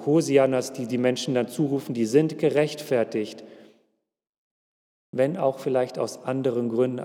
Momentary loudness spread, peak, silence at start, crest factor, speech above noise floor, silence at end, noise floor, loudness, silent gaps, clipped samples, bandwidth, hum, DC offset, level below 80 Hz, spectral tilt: 8 LU; -6 dBFS; 0 s; 18 dB; 52 dB; 0 s; -76 dBFS; -24 LUFS; 4.29-5.13 s; under 0.1%; 17 kHz; none; under 0.1%; -84 dBFS; -6 dB/octave